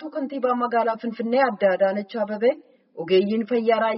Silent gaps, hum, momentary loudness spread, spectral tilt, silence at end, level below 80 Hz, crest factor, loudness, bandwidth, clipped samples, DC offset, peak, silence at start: none; none; 8 LU; -4 dB/octave; 0 s; -74 dBFS; 14 dB; -22 LUFS; 5.8 kHz; under 0.1%; under 0.1%; -8 dBFS; 0 s